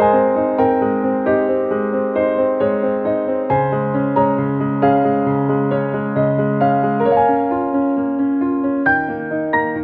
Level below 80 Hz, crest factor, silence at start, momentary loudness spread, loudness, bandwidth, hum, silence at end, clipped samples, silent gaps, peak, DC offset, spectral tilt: -50 dBFS; 14 dB; 0 s; 4 LU; -17 LUFS; 4.3 kHz; none; 0 s; under 0.1%; none; -2 dBFS; under 0.1%; -11 dB/octave